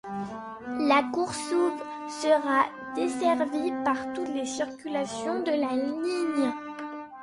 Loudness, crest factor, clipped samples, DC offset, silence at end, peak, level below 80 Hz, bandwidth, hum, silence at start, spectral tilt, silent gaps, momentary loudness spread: -28 LUFS; 20 dB; under 0.1%; under 0.1%; 0 s; -8 dBFS; -68 dBFS; 11.5 kHz; none; 0.05 s; -4 dB/octave; none; 13 LU